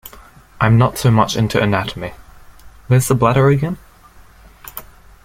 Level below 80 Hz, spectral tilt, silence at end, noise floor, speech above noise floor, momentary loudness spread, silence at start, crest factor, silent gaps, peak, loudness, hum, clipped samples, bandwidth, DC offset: -40 dBFS; -6 dB/octave; 0.4 s; -44 dBFS; 30 dB; 19 LU; 0.05 s; 16 dB; none; -2 dBFS; -15 LUFS; none; under 0.1%; 16.5 kHz; under 0.1%